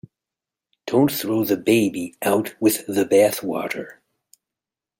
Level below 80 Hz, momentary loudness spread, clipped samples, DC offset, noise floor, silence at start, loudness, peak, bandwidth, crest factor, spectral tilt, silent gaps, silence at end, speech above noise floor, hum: -66 dBFS; 11 LU; under 0.1%; under 0.1%; -88 dBFS; 0.85 s; -21 LUFS; -4 dBFS; 17 kHz; 18 dB; -5 dB/octave; none; 1.05 s; 68 dB; none